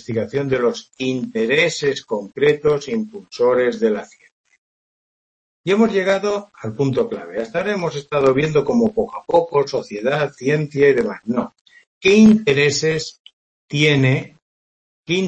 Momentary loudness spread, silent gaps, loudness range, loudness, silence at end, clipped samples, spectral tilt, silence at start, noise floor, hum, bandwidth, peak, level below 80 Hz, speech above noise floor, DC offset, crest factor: 10 LU; 4.32-4.44 s, 4.58-5.64 s, 11.61-11.65 s, 11.87-12.01 s, 13.19-13.24 s, 13.33-13.68 s, 14.42-15.04 s; 5 LU; -18 LUFS; 0 s; under 0.1%; -5.5 dB/octave; 0.1 s; under -90 dBFS; none; 8.6 kHz; -2 dBFS; -54 dBFS; over 72 dB; under 0.1%; 16 dB